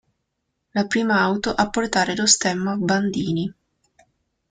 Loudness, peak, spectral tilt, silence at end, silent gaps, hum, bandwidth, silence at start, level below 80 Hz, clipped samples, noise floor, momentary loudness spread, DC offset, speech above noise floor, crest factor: -21 LUFS; -2 dBFS; -3.5 dB/octave; 1 s; none; none; 9.6 kHz; 0.75 s; -54 dBFS; under 0.1%; -76 dBFS; 9 LU; under 0.1%; 56 dB; 22 dB